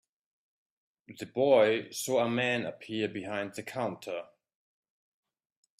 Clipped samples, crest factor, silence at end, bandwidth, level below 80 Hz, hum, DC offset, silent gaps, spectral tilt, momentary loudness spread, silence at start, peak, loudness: under 0.1%; 20 dB; 1.55 s; 15.5 kHz; -76 dBFS; none; under 0.1%; none; -4.5 dB/octave; 15 LU; 1.1 s; -12 dBFS; -30 LUFS